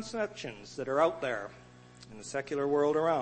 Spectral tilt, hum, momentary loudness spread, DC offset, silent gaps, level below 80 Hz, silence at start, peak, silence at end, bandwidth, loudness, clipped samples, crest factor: -5 dB/octave; none; 16 LU; under 0.1%; none; -68 dBFS; 0 s; -14 dBFS; 0 s; 8.8 kHz; -32 LUFS; under 0.1%; 18 dB